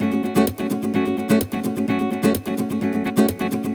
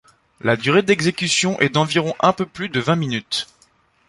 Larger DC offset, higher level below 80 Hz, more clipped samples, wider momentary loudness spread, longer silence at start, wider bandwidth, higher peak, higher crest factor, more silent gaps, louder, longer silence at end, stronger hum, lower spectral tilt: neither; first, -50 dBFS vs -56 dBFS; neither; second, 5 LU vs 8 LU; second, 0 s vs 0.45 s; first, over 20 kHz vs 11.5 kHz; about the same, -4 dBFS vs -2 dBFS; about the same, 16 dB vs 18 dB; neither; about the same, -21 LUFS vs -19 LUFS; second, 0 s vs 0.65 s; neither; first, -6 dB/octave vs -4 dB/octave